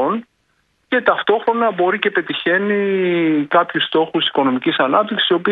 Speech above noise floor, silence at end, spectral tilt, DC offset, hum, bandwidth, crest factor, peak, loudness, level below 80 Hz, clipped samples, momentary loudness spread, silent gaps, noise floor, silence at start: 47 dB; 0 s; -7.5 dB/octave; under 0.1%; none; 4.7 kHz; 16 dB; 0 dBFS; -17 LUFS; -66 dBFS; under 0.1%; 3 LU; none; -64 dBFS; 0 s